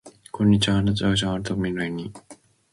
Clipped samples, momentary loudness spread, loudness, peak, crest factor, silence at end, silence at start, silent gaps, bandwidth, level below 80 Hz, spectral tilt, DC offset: under 0.1%; 14 LU; -23 LUFS; -8 dBFS; 16 dB; 0.4 s; 0.05 s; none; 11.5 kHz; -44 dBFS; -5.5 dB/octave; under 0.1%